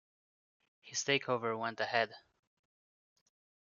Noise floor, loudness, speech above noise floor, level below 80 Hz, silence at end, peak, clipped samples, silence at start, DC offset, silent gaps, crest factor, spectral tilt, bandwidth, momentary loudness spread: under -90 dBFS; -35 LUFS; over 55 dB; -86 dBFS; 1.5 s; -14 dBFS; under 0.1%; 0.85 s; under 0.1%; none; 26 dB; -1.5 dB/octave; 7.4 kHz; 6 LU